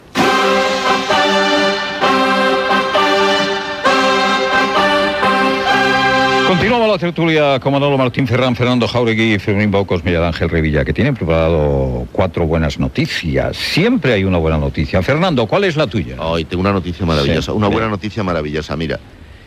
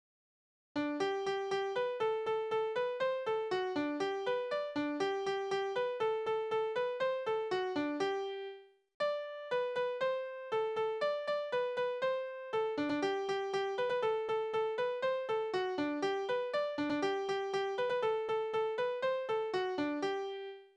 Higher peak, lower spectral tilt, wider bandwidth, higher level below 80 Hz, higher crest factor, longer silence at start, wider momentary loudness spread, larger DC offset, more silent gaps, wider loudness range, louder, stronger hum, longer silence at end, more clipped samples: first, 0 dBFS vs -22 dBFS; about the same, -5.5 dB/octave vs -4.5 dB/octave; first, 15 kHz vs 10 kHz; first, -32 dBFS vs -78 dBFS; about the same, 14 dB vs 14 dB; second, 0.15 s vs 0.75 s; first, 6 LU vs 3 LU; neither; second, none vs 8.94-9.00 s; about the same, 3 LU vs 2 LU; first, -14 LUFS vs -36 LUFS; neither; about the same, 0 s vs 0.1 s; neither